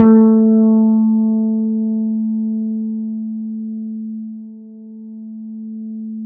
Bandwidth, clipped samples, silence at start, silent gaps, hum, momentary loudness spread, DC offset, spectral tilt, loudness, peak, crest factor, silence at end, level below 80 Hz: 2 kHz; under 0.1%; 0 s; none; none; 22 LU; under 0.1%; -12.5 dB/octave; -16 LUFS; 0 dBFS; 16 dB; 0 s; -64 dBFS